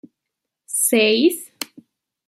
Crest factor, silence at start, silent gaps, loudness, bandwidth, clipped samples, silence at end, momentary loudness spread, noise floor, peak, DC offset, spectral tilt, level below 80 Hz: 18 dB; 0.7 s; none; -17 LUFS; 15.5 kHz; under 0.1%; 0.65 s; 18 LU; -82 dBFS; -4 dBFS; under 0.1%; -2 dB/octave; -78 dBFS